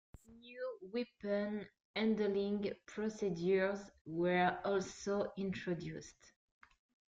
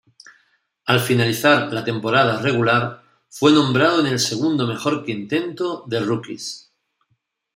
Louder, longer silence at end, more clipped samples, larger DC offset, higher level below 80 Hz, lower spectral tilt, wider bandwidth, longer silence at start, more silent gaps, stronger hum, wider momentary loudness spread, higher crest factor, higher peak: second, -38 LUFS vs -19 LUFS; about the same, 1 s vs 0.95 s; neither; neither; second, -70 dBFS vs -60 dBFS; about the same, -6 dB/octave vs -5 dB/octave; second, 7.8 kHz vs 16 kHz; second, 0.3 s vs 0.85 s; first, 1.85-1.94 s, 4.01-4.05 s vs none; neither; about the same, 12 LU vs 11 LU; about the same, 18 dB vs 20 dB; second, -20 dBFS vs -2 dBFS